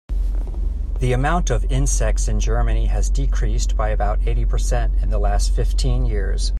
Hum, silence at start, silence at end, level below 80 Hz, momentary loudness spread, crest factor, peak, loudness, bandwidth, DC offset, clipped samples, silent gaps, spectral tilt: none; 0.1 s; 0 s; -18 dBFS; 5 LU; 10 dB; -6 dBFS; -22 LUFS; 10.5 kHz; under 0.1%; under 0.1%; none; -5 dB/octave